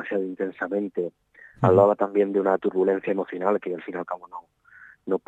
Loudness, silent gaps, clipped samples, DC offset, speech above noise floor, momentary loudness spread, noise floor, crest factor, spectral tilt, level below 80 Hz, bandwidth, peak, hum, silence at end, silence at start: -24 LUFS; none; under 0.1%; under 0.1%; 28 dB; 15 LU; -51 dBFS; 20 dB; -9.5 dB/octave; -68 dBFS; 7.6 kHz; -4 dBFS; none; 0.1 s; 0 s